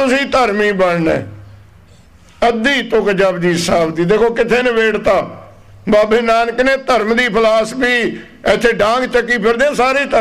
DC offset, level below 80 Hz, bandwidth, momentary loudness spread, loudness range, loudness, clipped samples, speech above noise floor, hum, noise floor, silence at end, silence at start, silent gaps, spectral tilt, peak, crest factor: 0.3%; -40 dBFS; 14.5 kHz; 4 LU; 2 LU; -13 LUFS; under 0.1%; 31 dB; none; -44 dBFS; 0 s; 0 s; none; -4.5 dB/octave; -2 dBFS; 12 dB